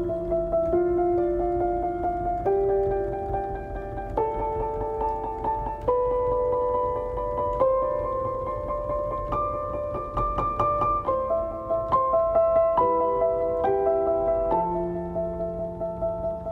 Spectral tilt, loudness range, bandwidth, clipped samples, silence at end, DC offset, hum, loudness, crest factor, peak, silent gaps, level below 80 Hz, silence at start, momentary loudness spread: -10 dB/octave; 4 LU; 4.9 kHz; under 0.1%; 0 s; under 0.1%; none; -26 LUFS; 16 dB; -10 dBFS; none; -40 dBFS; 0 s; 8 LU